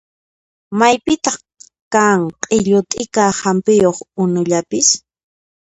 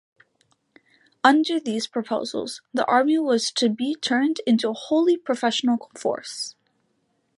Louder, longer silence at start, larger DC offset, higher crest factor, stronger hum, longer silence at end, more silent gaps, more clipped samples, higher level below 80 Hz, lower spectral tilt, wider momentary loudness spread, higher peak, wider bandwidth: first, -15 LUFS vs -23 LUFS; second, 0.7 s vs 1.25 s; neither; second, 16 dB vs 22 dB; neither; about the same, 0.8 s vs 0.9 s; first, 1.81-1.91 s vs none; neither; first, -52 dBFS vs -76 dBFS; about the same, -4 dB/octave vs -3.5 dB/octave; second, 7 LU vs 10 LU; about the same, 0 dBFS vs -2 dBFS; second, 10 kHz vs 11.5 kHz